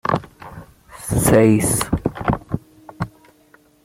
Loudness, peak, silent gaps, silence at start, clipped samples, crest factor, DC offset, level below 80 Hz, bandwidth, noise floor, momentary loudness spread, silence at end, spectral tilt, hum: -18 LUFS; -2 dBFS; none; 0.05 s; under 0.1%; 18 dB; under 0.1%; -38 dBFS; 16.5 kHz; -53 dBFS; 21 LU; 0.8 s; -5.5 dB/octave; none